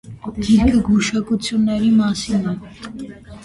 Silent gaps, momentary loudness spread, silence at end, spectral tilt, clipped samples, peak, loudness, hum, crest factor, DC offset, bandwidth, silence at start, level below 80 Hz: none; 18 LU; 0 s; -5.5 dB/octave; under 0.1%; -4 dBFS; -17 LUFS; none; 14 dB; under 0.1%; 11.5 kHz; 0.05 s; -36 dBFS